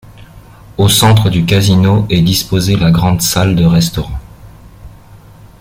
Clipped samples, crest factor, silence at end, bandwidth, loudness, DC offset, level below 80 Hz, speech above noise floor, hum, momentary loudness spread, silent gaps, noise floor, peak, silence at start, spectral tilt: under 0.1%; 12 dB; 0.7 s; 16.5 kHz; -10 LUFS; under 0.1%; -32 dBFS; 27 dB; none; 9 LU; none; -37 dBFS; 0 dBFS; 0.2 s; -5 dB/octave